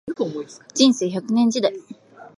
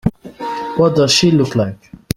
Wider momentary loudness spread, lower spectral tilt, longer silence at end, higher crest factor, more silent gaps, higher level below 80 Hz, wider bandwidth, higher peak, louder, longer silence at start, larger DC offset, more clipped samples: about the same, 14 LU vs 13 LU; about the same, -4 dB/octave vs -5 dB/octave; second, 0.1 s vs 0.4 s; about the same, 18 dB vs 16 dB; neither; second, -68 dBFS vs -42 dBFS; second, 11.5 kHz vs 16.5 kHz; about the same, -2 dBFS vs 0 dBFS; second, -20 LUFS vs -15 LUFS; about the same, 0.05 s vs 0.05 s; neither; neither